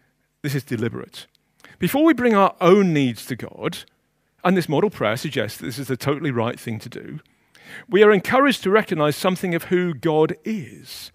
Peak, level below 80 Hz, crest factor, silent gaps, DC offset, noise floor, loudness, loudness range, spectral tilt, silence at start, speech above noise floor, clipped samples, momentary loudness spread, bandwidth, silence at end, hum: 0 dBFS; -60 dBFS; 20 dB; none; under 0.1%; -58 dBFS; -20 LUFS; 5 LU; -6 dB/octave; 0.45 s; 38 dB; under 0.1%; 20 LU; 15.5 kHz; 0.05 s; none